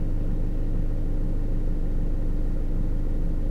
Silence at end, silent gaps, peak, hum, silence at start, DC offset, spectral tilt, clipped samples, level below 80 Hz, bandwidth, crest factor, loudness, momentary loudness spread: 0 s; none; -16 dBFS; none; 0 s; under 0.1%; -9.5 dB/octave; under 0.1%; -24 dBFS; 2.2 kHz; 8 dB; -31 LUFS; 0 LU